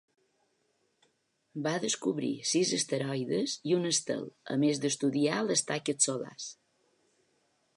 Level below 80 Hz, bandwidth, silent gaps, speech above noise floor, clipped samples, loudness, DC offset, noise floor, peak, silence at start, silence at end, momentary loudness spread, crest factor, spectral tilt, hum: -84 dBFS; 11.5 kHz; none; 44 dB; under 0.1%; -30 LUFS; under 0.1%; -75 dBFS; -10 dBFS; 1.55 s; 1.25 s; 9 LU; 22 dB; -3.5 dB/octave; none